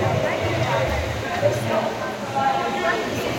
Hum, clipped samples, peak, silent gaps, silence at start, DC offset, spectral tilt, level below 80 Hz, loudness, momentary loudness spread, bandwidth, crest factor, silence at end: none; under 0.1%; -8 dBFS; none; 0 s; under 0.1%; -5 dB/octave; -42 dBFS; -23 LUFS; 4 LU; 16.5 kHz; 14 dB; 0 s